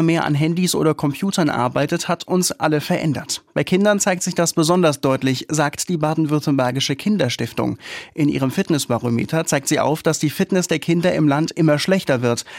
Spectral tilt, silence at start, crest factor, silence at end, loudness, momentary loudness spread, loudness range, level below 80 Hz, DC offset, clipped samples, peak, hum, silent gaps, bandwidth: -5 dB/octave; 0 s; 14 dB; 0 s; -19 LUFS; 5 LU; 2 LU; -56 dBFS; under 0.1%; under 0.1%; -4 dBFS; none; none; 16.5 kHz